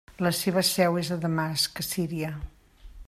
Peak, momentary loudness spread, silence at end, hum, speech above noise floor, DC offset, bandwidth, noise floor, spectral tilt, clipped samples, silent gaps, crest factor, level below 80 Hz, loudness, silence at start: -10 dBFS; 11 LU; 0.05 s; none; 20 dB; under 0.1%; 15 kHz; -47 dBFS; -4 dB/octave; under 0.1%; none; 18 dB; -50 dBFS; -26 LUFS; 0.1 s